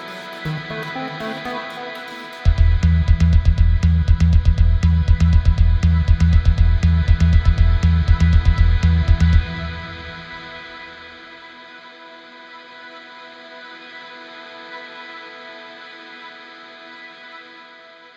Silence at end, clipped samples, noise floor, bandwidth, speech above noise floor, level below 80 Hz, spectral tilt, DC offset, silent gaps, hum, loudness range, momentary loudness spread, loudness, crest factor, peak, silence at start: 0.75 s; under 0.1%; -43 dBFS; 7.2 kHz; 17 dB; -20 dBFS; -7.5 dB/octave; under 0.1%; none; none; 20 LU; 22 LU; -17 LUFS; 16 dB; -2 dBFS; 0 s